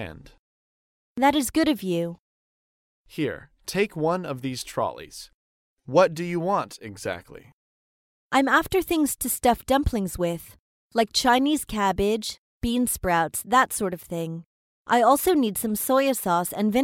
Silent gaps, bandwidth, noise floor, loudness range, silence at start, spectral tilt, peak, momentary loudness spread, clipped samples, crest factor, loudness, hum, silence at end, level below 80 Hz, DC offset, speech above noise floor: 0.39-1.16 s, 2.19-3.05 s, 5.34-5.77 s, 7.53-8.30 s, 10.59-10.90 s, 12.38-12.61 s, 14.46-14.85 s; 17 kHz; under -90 dBFS; 5 LU; 0 s; -4 dB/octave; -6 dBFS; 14 LU; under 0.1%; 20 dB; -24 LUFS; none; 0 s; -46 dBFS; under 0.1%; over 66 dB